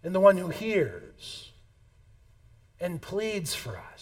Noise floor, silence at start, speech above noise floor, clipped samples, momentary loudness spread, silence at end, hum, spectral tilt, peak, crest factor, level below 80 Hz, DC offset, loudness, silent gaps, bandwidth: -58 dBFS; 0.05 s; 31 dB; under 0.1%; 20 LU; 0 s; none; -5 dB/octave; -6 dBFS; 24 dB; -58 dBFS; under 0.1%; -28 LUFS; none; 17 kHz